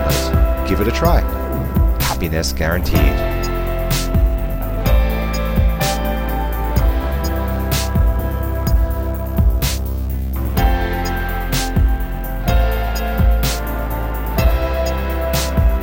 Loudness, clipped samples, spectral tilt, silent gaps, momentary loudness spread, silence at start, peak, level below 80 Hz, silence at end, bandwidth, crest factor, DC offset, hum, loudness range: -19 LUFS; under 0.1%; -5.5 dB/octave; none; 6 LU; 0 s; 0 dBFS; -18 dBFS; 0 s; 17 kHz; 16 dB; under 0.1%; none; 2 LU